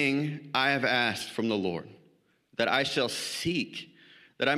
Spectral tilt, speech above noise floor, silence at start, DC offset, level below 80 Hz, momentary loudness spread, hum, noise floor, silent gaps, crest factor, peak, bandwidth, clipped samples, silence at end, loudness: -4 dB/octave; 37 dB; 0 s; under 0.1%; -68 dBFS; 13 LU; none; -66 dBFS; none; 22 dB; -8 dBFS; 15 kHz; under 0.1%; 0 s; -29 LUFS